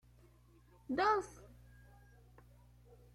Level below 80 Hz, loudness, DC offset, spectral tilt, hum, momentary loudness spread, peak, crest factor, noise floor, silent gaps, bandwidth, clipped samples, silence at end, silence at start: -64 dBFS; -35 LUFS; under 0.1%; -5 dB/octave; 60 Hz at -60 dBFS; 27 LU; -22 dBFS; 20 dB; -65 dBFS; none; 15.5 kHz; under 0.1%; 1.75 s; 0.9 s